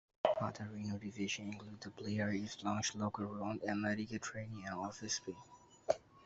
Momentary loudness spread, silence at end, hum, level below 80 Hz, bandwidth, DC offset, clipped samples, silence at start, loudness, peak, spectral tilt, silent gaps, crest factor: 10 LU; 0 s; none; -74 dBFS; 8 kHz; under 0.1%; under 0.1%; 0.25 s; -41 LUFS; -16 dBFS; -4.5 dB/octave; none; 24 dB